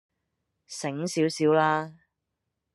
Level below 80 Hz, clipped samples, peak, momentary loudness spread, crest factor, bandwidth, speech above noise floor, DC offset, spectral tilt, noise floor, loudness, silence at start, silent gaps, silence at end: -74 dBFS; under 0.1%; -8 dBFS; 16 LU; 20 dB; 12 kHz; 57 dB; under 0.1%; -5 dB/octave; -83 dBFS; -26 LUFS; 0.7 s; none; 0.8 s